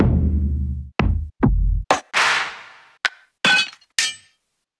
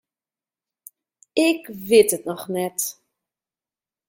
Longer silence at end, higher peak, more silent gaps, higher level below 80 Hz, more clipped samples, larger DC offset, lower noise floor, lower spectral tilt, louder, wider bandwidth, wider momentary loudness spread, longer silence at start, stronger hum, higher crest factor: second, 0.65 s vs 1.15 s; about the same, -2 dBFS vs -2 dBFS; neither; first, -26 dBFS vs -68 dBFS; neither; neither; second, -69 dBFS vs under -90 dBFS; about the same, -4 dB/octave vs -3.5 dB/octave; about the same, -20 LUFS vs -21 LUFS; second, 11 kHz vs 17 kHz; second, 9 LU vs 12 LU; second, 0 s vs 1.35 s; neither; about the same, 18 dB vs 22 dB